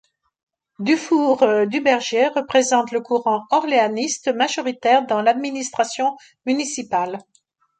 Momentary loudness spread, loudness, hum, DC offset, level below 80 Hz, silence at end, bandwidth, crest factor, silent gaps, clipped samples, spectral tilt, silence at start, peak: 7 LU; -19 LUFS; none; under 0.1%; -68 dBFS; 0.6 s; 9.4 kHz; 18 dB; none; under 0.1%; -3 dB/octave; 0.8 s; -2 dBFS